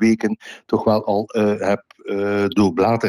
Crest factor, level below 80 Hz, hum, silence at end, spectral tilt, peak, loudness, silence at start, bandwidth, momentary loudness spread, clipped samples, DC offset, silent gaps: 12 dB; -56 dBFS; none; 0 s; -6.5 dB/octave; -6 dBFS; -20 LUFS; 0 s; 12.5 kHz; 8 LU; under 0.1%; under 0.1%; none